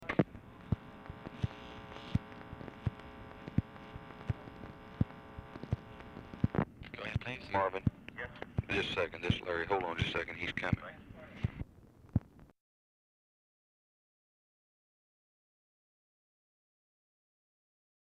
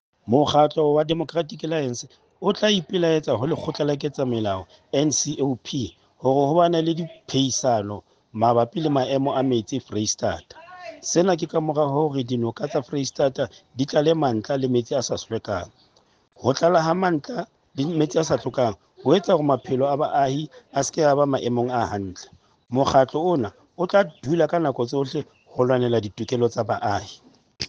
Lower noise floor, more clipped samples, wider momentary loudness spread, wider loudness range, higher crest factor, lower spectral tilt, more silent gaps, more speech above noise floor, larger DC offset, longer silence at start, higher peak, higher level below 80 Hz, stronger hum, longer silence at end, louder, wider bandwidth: about the same, -59 dBFS vs -61 dBFS; neither; first, 16 LU vs 11 LU; first, 9 LU vs 2 LU; about the same, 24 dB vs 20 dB; first, -7 dB/octave vs -5 dB/octave; neither; second, 24 dB vs 39 dB; neither; second, 0 s vs 0.25 s; second, -16 dBFS vs -4 dBFS; about the same, -54 dBFS vs -58 dBFS; neither; first, 5.6 s vs 0 s; second, -38 LUFS vs -23 LUFS; about the same, 10.5 kHz vs 10 kHz